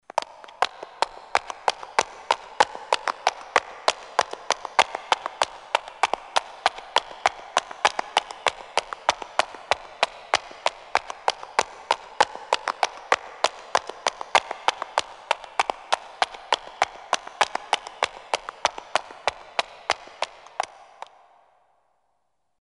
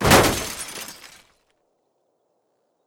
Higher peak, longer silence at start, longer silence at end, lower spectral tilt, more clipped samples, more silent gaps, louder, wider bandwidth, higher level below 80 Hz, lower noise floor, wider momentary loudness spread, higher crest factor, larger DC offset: about the same, -2 dBFS vs -4 dBFS; first, 0.15 s vs 0 s; about the same, 2 s vs 1.95 s; second, 0 dB/octave vs -3.5 dB/octave; neither; neither; second, -26 LUFS vs -21 LUFS; second, 11.5 kHz vs 18 kHz; second, -64 dBFS vs -40 dBFS; first, -75 dBFS vs -70 dBFS; second, 6 LU vs 22 LU; first, 26 dB vs 20 dB; neither